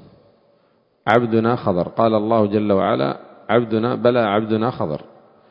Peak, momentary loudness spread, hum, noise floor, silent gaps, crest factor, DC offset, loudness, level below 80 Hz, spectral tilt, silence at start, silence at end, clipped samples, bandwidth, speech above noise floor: 0 dBFS; 9 LU; none; -60 dBFS; none; 20 dB; under 0.1%; -19 LUFS; -54 dBFS; -9 dB/octave; 1.05 s; 0.5 s; under 0.1%; 5.4 kHz; 42 dB